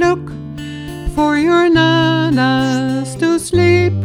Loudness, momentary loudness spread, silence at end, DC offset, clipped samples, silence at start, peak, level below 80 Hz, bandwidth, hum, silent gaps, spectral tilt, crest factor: -14 LUFS; 15 LU; 0 s; under 0.1%; under 0.1%; 0 s; -2 dBFS; -34 dBFS; 13 kHz; none; none; -6 dB/octave; 12 dB